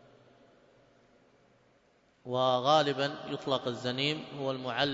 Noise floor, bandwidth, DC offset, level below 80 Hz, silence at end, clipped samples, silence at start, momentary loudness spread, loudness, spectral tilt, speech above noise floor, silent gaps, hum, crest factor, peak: -67 dBFS; 7.8 kHz; under 0.1%; -74 dBFS; 0 s; under 0.1%; 2.25 s; 11 LU; -31 LUFS; -5 dB/octave; 37 dB; none; none; 22 dB; -12 dBFS